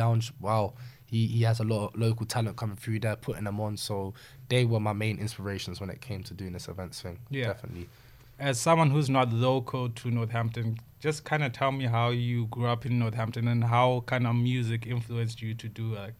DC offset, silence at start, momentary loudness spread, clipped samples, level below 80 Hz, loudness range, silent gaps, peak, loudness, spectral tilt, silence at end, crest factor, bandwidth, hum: under 0.1%; 0 s; 14 LU; under 0.1%; -60 dBFS; 5 LU; none; -10 dBFS; -29 LUFS; -6 dB/octave; 0.05 s; 18 dB; 14 kHz; none